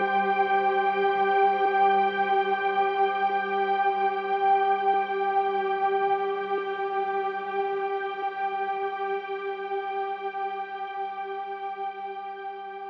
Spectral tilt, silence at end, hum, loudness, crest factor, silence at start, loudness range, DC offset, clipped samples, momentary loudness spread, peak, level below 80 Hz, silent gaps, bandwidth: -6.5 dB/octave; 0 s; none; -26 LUFS; 14 dB; 0 s; 8 LU; under 0.1%; under 0.1%; 11 LU; -12 dBFS; -86 dBFS; none; 5.8 kHz